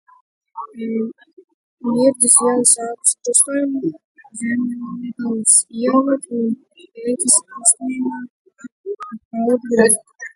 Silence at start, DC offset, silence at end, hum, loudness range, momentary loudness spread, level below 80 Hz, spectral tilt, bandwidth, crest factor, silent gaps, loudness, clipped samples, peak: 0.55 s; under 0.1%; 0.1 s; none; 3 LU; 17 LU; -64 dBFS; -2.5 dB/octave; 12 kHz; 18 dB; 1.33-1.37 s, 1.44-1.48 s, 1.54-1.77 s, 4.04-4.15 s, 8.30-8.45 s, 8.72-8.84 s, 9.25-9.31 s; -16 LUFS; under 0.1%; 0 dBFS